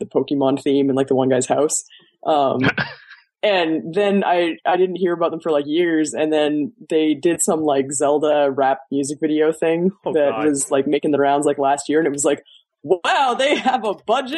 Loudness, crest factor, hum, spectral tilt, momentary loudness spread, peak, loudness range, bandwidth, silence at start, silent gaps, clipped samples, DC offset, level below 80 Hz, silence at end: -19 LUFS; 16 dB; none; -4 dB/octave; 5 LU; -2 dBFS; 1 LU; 12 kHz; 0 s; none; under 0.1%; under 0.1%; -64 dBFS; 0 s